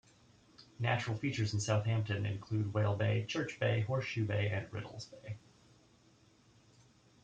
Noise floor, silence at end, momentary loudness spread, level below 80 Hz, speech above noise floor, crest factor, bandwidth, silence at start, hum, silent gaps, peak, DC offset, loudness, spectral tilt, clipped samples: -66 dBFS; 1.85 s; 14 LU; -68 dBFS; 31 dB; 18 dB; 8.8 kHz; 0.6 s; none; none; -20 dBFS; under 0.1%; -36 LUFS; -6 dB/octave; under 0.1%